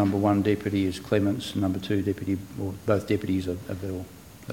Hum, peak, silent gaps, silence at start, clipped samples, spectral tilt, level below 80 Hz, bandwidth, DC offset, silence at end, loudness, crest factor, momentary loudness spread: none; -8 dBFS; none; 0 s; under 0.1%; -7 dB/octave; -54 dBFS; 17 kHz; under 0.1%; 0 s; -27 LUFS; 18 dB; 11 LU